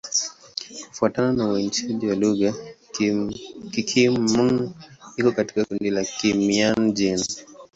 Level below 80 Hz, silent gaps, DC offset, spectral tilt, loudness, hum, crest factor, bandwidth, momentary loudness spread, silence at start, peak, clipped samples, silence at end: -56 dBFS; none; under 0.1%; -4 dB/octave; -22 LUFS; none; 18 dB; 8 kHz; 14 LU; 0.05 s; -6 dBFS; under 0.1%; 0.1 s